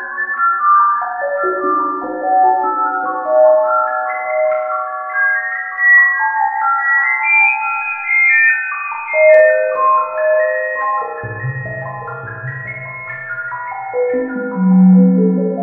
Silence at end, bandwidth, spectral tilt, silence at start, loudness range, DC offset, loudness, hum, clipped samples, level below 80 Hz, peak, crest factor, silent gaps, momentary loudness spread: 0 s; 2.8 kHz; -12 dB/octave; 0 s; 10 LU; under 0.1%; -13 LUFS; none; under 0.1%; -60 dBFS; 0 dBFS; 14 dB; none; 15 LU